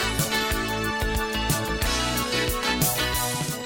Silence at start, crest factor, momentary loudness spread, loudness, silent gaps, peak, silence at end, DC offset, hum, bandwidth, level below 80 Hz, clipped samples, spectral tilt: 0 s; 16 dB; 4 LU; -24 LUFS; none; -10 dBFS; 0 s; 0.2%; none; 19 kHz; -34 dBFS; under 0.1%; -3 dB/octave